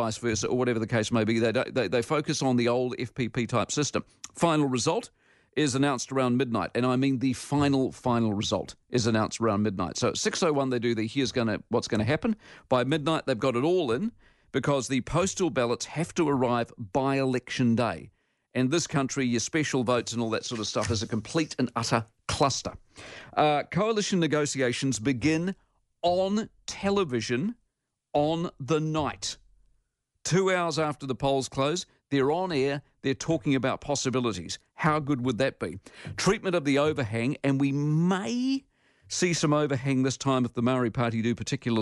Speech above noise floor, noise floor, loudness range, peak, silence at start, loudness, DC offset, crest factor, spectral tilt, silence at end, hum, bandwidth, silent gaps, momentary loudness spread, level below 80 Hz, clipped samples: 54 dB; -80 dBFS; 2 LU; -10 dBFS; 0 s; -27 LUFS; under 0.1%; 18 dB; -5 dB/octave; 0 s; none; 11.5 kHz; none; 7 LU; -56 dBFS; under 0.1%